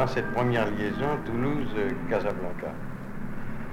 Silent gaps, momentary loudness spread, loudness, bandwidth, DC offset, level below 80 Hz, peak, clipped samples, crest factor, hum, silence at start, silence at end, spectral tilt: none; 12 LU; -30 LUFS; 12 kHz; under 0.1%; -42 dBFS; -12 dBFS; under 0.1%; 16 dB; none; 0 s; 0 s; -7.5 dB/octave